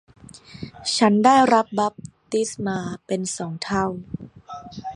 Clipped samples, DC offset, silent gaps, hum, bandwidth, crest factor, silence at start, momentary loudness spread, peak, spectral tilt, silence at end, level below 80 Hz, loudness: under 0.1%; under 0.1%; none; none; 11.5 kHz; 20 dB; 0.35 s; 22 LU; -2 dBFS; -4.5 dB/octave; 0 s; -56 dBFS; -21 LUFS